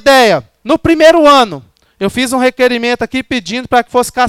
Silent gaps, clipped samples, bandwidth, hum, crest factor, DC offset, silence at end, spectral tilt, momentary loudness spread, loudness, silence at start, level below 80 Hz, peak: none; under 0.1%; 18 kHz; none; 10 dB; under 0.1%; 0 s; -4 dB/octave; 11 LU; -10 LUFS; 0.05 s; -40 dBFS; 0 dBFS